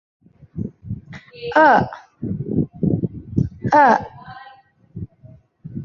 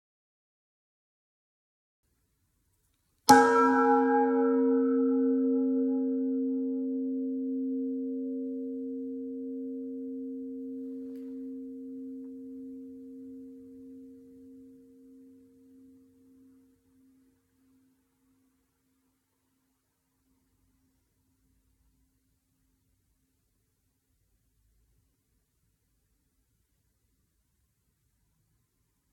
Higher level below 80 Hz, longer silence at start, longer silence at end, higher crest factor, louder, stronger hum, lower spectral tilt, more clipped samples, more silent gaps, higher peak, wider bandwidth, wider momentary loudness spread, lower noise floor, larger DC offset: first, -44 dBFS vs -78 dBFS; second, 0.55 s vs 3.25 s; second, 0 s vs 13.95 s; second, 18 dB vs 32 dB; first, -18 LUFS vs -28 LUFS; neither; first, -8 dB/octave vs -4 dB/octave; neither; neither; about the same, -2 dBFS vs -2 dBFS; second, 7 kHz vs 15 kHz; about the same, 24 LU vs 23 LU; second, -48 dBFS vs -77 dBFS; neither